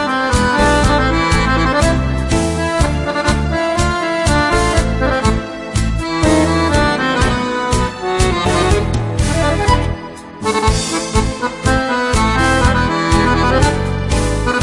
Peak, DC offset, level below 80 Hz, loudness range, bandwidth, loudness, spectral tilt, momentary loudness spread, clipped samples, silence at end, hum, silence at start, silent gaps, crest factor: 0 dBFS; under 0.1%; -22 dBFS; 2 LU; 11.5 kHz; -15 LUFS; -5 dB/octave; 5 LU; under 0.1%; 0 s; none; 0 s; none; 14 dB